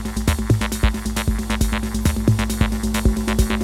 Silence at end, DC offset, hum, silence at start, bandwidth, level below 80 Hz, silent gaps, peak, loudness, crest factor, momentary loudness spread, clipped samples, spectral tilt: 0 s; under 0.1%; none; 0 s; 16.5 kHz; -24 dBFS; none; -2 dBFS; -21 LUFS; 16 dB; 3 LU; under 0.1%; -5.5 dB/octave